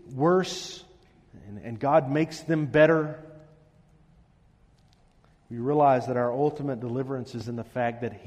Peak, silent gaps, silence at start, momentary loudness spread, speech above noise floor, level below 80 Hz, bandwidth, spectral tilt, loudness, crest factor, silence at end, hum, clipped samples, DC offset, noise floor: -6 dBFS; none; 0.05 s; 18 LU; 35 dB; -62 dBFS; 13 kHz; -6.5 dB/octave; -26 LUFS; 20 dB; 0 s; none; under 0.1%; under 0.1%; -60 dBFS